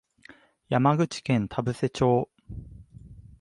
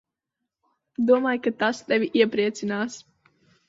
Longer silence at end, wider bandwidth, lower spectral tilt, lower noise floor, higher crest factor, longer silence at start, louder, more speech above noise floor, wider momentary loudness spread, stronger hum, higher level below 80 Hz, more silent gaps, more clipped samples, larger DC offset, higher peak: second, 0.2 s vs 0.65 s; first, 11.5 kHz vs 7.8 kHz; first, -7 dB/octave vs -5 dB/octave; second, -54 dBFS vs -84 dBFS; about the same, 20 dB vs 20 dB; second, 0.7 s vs 1 s; second, -26 LUFS vs -23 LUFS; second, 30 dB vs 61 dB; first, 19 LU vs 11 LU; neither; first, -52 dBFS vs -72 dBFS; neither; neither; neither; second, -8 dBFS vs -4 dBFS